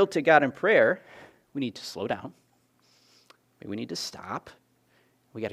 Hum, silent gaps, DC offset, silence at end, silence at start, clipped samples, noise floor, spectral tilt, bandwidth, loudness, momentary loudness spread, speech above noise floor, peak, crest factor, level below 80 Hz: none; none; under 0.1%; 0 s; 0 s; under 0.1%; -66 dBFS; -4.5 dB/octave; 15 kHz; -26 LUFS; 19 LU; 40 dB; -4 dBFS; 24 dB; -74 dBFS